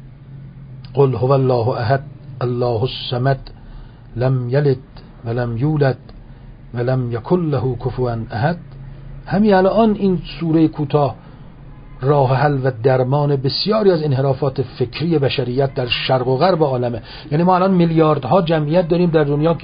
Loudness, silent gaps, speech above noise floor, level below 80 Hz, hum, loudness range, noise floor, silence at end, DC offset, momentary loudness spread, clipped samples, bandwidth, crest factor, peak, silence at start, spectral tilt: -17 LUFS; none; 21 dB; -40 dBFS; none; 5 LU; -38 dBFS; 0 s; under 0.1%; 11 LU; under 0.1%; 5.2 kHz; 16 dB; -2 dBFS; 0 s; -12.5 dB/octave